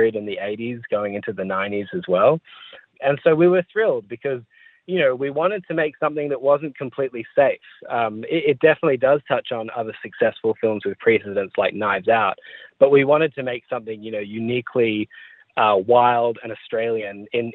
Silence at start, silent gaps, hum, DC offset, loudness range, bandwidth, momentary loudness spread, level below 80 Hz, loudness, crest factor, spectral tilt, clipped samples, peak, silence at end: 0 s; none; none; under 0.1%; 3 LU; 4.2 kHz; 13 LU; -68 dBFS; -21 LUFS; 18 dB; -9.5 dB/octave; under 0.1%; -2 dBFS; 0 s